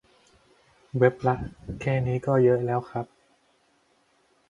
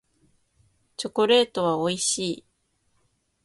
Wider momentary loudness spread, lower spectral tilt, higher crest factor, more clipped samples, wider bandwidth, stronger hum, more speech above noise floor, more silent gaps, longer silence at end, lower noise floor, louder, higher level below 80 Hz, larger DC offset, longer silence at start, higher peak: about the same, 14 LU vs 16 LU; first, -9 dB/octave vs -3 dB/octave; about the same, 22 dB vs 20 dB; neither; second, 7.4 kHz vs 11.5 kHz; neither; second, 42 dB vs 47 dB; neither; first, 1.45 s vs 1.1 s; second, -66 dBFS vs -70 dBFS; about the same, -25 LUFS vs -23 LUFS; first, -52 dBFS vs -66 dBFS; neither; about the same, 0.95 s vs 1 s; about the same, -6 dBFS vs -6 dBFS